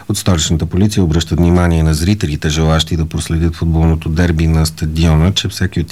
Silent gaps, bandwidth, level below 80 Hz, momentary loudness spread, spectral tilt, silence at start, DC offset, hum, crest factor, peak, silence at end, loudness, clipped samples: none; 15 kHz; -22 dBFS; 5 LU; -5.5 dB/octave; 0 s; 0.7%; none; 12 dB; 0 dBFS; 0 s; -14 LUFS; under 0.1%